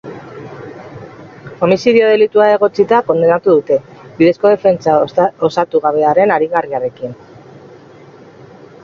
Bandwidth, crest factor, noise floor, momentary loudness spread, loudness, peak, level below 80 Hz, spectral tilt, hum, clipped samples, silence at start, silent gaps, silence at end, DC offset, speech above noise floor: 7.2 kHz; 14 dB; -39 dBFS; 21 LU; -12 LUFS; 0 dBFS; -56 dBFS; -7 dB/octave; none; under 0.1%; 0.05 s; none; 1.7 s; under 0.1%; 27 dB